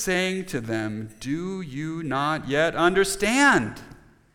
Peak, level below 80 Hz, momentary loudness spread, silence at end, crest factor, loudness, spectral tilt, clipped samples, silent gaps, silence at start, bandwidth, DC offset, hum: -6 dBFS; -50 dBFS; 13 LU; 0.4 s; 18 dB; -24 LUFS; -4 dB/octave; under 0.1%; none; 0 s; 19 kHz; under 0.1%; none